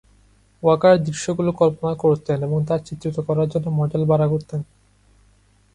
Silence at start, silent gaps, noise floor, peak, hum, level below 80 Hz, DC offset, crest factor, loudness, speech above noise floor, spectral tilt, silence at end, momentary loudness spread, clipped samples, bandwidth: 0.65 s; none; -57 dBFS; -4 dBFS; 50 Hz at -50 dBFS; -52 dBFS; under 0.1%; 18 dB; -20 LUFS; 37 dB; -7.5 dB/octave; 1.1 s; 10 LU; under 0.1%; 10.5 kHz